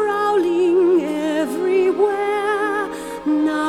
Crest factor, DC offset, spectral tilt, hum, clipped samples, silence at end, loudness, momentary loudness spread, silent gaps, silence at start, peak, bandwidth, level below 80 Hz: 12 dB; under 0.1%; -5 dB/octave; none; under 0.1%; 0 s; -19 LUFS; 6 LU; none; 0 s; -6 dBFS; 14 kHz; -56 dBFS